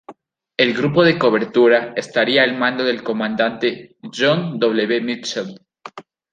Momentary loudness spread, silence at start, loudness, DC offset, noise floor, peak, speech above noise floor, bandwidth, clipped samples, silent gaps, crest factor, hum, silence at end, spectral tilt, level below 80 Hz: 17 LU; 0.1 s; -17 LUFS; under 0.1%; -44 dBFS; -2 dBFS; 27 dB; 9.2 kHz; under 0.1%; none; 18 dB; none; 0.3 s; -5 dB/octave; -62 dBFS